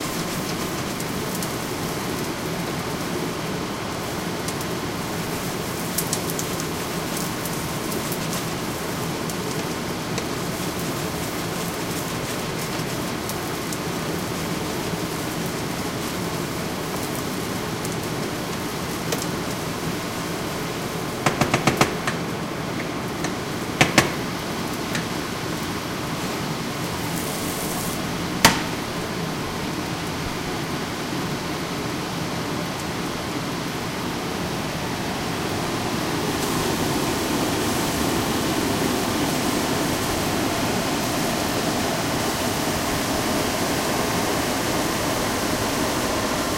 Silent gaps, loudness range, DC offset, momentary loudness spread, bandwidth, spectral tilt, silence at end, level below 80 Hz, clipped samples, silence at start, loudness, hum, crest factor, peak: none; 4 LU; under 0.1%; 5 LU; 17 kHz; -4 dB/octave; 0 s; -44 dBFS; under 0.1%; 0 s; -25 LUFS; none; 26 dB; 0 dBFS